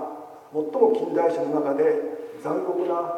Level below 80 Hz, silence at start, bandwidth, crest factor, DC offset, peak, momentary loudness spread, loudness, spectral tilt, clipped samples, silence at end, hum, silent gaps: -80 dBFS; 0 s; 9.6 kHz; 18 dB; under 0.1%; -6 dBFS; 12 LU; -24 LUFS; -7.5 dB/octave; under 0.1%; 0 s; none; none